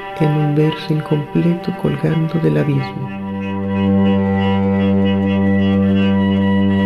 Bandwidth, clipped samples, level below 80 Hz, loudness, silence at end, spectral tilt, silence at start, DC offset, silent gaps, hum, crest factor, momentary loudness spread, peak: 5.4 kHz; under 0.1%; -50 dBFS; -16 LUFS; 0 s; -9 dB/octave; 0 s; under 0.1%; none; none; 12 dB; 6 LU; -4 dBFS